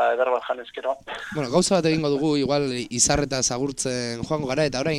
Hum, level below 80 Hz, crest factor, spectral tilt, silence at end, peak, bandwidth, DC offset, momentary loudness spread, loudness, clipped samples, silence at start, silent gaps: none; -46 dBFS; 18 dB; -4 dB/octave; 0 s; -6 dBFS; 14 kHz; under 0.1%; 10 LU; -23 LUFS; under 0.1%; 0 s; none